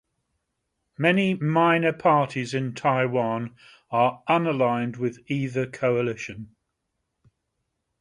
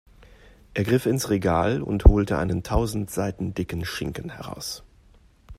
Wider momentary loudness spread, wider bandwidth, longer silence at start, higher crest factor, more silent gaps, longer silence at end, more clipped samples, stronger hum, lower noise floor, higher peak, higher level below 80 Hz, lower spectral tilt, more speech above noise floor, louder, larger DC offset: second, 9 LU vs 15 LU; second, 11 kHz vs 15.5 kHz; first, 1 s vs 0.75 s; about the same, 20 dB vs 24 dB; neither; first, 1.55 s vs 0.05 s; neither; neither; first, -79 dBFS vs -55 dBFS; second, -4 dBFS vs 0 dBFS; second, -66 dBFS vs -28 dBFS; about the same, -7 dB/octave vs -6 dB/octave; first, 55 dB vs 32 dB; about the same, -24 LUFS vs -25 LUFS; neither